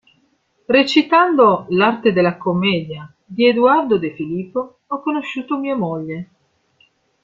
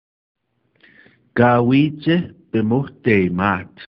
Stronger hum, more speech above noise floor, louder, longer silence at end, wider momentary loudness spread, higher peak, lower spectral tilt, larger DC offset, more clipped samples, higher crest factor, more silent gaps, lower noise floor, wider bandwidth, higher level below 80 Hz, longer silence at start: neither; first, 45 dB vs 41 dB; about the same, -17 LUFS vs -18 LUFS; first, 1 s vs 0.1 s; first, 14 LU vs 9 LU; about the same, -2 dBFS vs 0 dBFS; second, -6.5 dB/octave vs -10.5 dB/octave; neither; neither; about the same, 16 dB vs 18 dB; neither; first, -62 dBFS vs -58 dBFS; first, 7.6 kHz vs 5.8 kHz; second, -60 dBFS vs -52 dBFS; second, 0.7 s vs 1.35 s